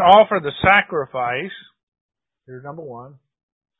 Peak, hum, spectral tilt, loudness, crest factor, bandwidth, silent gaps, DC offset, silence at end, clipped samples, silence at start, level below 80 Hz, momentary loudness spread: 0 dBFS; none; -7 dB/octave; -17 LUFS; 20 dB; 4 kHz; 1.83-1.92 s, 2.01-2.09 s; under 0.1%; 0.75 s; under 0.1%; 0 s; -48 dBFS; 24 LU